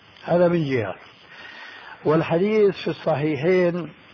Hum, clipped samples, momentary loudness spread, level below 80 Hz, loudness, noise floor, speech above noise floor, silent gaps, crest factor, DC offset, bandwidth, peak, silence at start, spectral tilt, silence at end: none; under 0.1%; 19 LU; -60 dBFS; -22 LUFS; -42 dBFS; 21 dB; none; 14 dB; under 0.1%; 5.4 kHz; -8 dBFS; 0.25 s; -8.5 dB/octave; 0.2 s